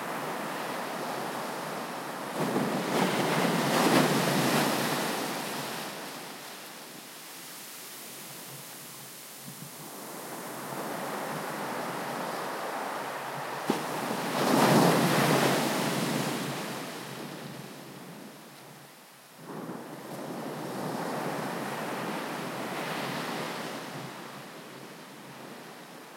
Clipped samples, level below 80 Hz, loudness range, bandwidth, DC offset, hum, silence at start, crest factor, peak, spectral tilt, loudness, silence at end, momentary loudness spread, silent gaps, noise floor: under 0.1%; -78 dBFS; 15 LU; 16.5 kHz; under 0.1%; none; 0 s; 22 dB; -10 dBFS; -4 dB/octave; -31 LUFS; 0 s; 20 LU; none; -52 dBFS